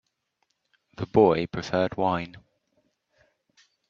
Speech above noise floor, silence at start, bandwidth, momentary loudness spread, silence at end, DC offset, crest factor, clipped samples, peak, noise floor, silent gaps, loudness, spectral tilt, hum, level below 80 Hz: 52 dB; 1 s; 7.2 kHz; 14 LU; 1.5 s; under 0.1%; 24 dB; under 0.1%; -6 dBFS; -76 dBFS; none; -24 LUFS; -7 dB/octave; none; -58 dBFS